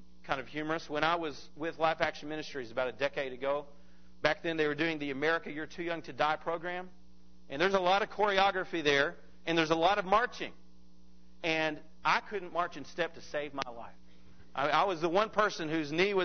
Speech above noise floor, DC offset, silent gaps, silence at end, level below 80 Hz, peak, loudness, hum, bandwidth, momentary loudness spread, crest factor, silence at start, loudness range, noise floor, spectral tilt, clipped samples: 29 dB; 0.4%; none; 0 s; -62 dBFS; -6 dBFS; -32 LUFS; none; 6.6 kHz; 12 LU; 26 dB; 0.25 s; 5 LU; -61 dBFS; -4.5 dB/octave; under 0.1%